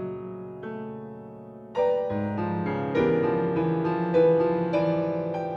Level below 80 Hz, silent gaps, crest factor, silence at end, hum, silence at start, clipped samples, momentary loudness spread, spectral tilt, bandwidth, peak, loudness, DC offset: -58 dBFS; none; 16 dB; 0 s; none; 0 s; under 0.1%; 16 LU; -9.5 dB/octave; 6.2 kHz; -10 dBFS; -25 LUFS; under 0.1%